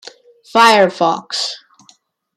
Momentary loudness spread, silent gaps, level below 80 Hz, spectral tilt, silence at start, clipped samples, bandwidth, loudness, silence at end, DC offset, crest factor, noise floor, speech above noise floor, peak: 13 LU; none; -66 dBFS; -3 dB/octave; 0.05 s; under 0.1%; 16 kHz; -13 LUFS; 0.8 s; under 0.1%; 16 dB; -53 dBFS; 40 dB; 0 dBFS